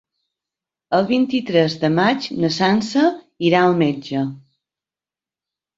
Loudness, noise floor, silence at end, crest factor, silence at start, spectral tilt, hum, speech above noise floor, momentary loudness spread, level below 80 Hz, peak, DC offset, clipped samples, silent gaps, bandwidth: -18 LUFS; under -90 dBFS; 1.4 s; 18 dB; 0.9 s; -6 dB/octave; none; over 73 dB; 7 LU; -60 dBFS; -2 dBFS; under 0.1%; under 0.1%; none; 7.8 kHz